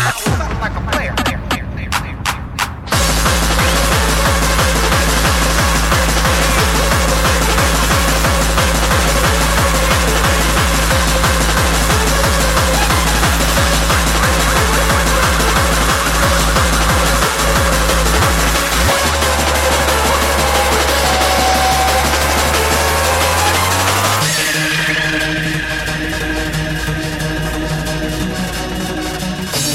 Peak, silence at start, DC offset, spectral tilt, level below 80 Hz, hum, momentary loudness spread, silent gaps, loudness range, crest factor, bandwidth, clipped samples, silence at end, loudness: 0 dBFS; 0 s; under 0.1%; -3.5 dB/octave; -20 dBFS; none; 7 LU; none; 4 LU; 14 dB; 16.5 kHz; under 0.1%; 0 s; -13 LUFS